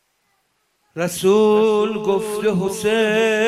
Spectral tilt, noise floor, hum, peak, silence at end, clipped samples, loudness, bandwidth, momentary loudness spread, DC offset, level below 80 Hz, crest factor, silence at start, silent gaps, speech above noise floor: -5 dB/octave; -67 dBFS; none; -6 dBFS; 0 s; under 0.1%; -18 LUFS; 15 kHz; 9 LU; under 0.1%; -58 dBFS; 12 dB; 0.95 s; none; 50 dB